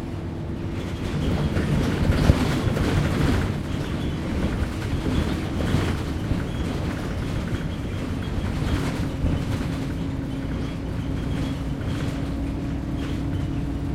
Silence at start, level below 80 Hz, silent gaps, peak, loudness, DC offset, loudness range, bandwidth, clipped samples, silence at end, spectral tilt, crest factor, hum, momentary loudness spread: 0 s; -32 dBFS; none; -2 dBFS; -26 LUFS; under 0.1%; 5 LU; 16 kHz; under 0.1%; 0 s; -7 dB/octave; 24 dB; none; 7 LU